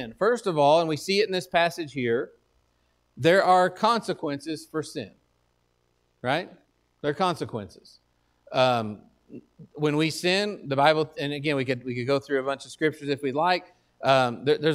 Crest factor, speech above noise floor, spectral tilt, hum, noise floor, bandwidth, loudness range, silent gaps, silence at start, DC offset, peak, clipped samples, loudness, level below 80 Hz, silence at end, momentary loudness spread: 22 dB; 45 dB; -5 dB/octave; none; -70 dBFS; 15 kHz; 8 LU; none; 0 s; under 0.1%; -4 dBFS; under 0.1%; -25 LUFS; -66 dBFS; 0 s; 12 LU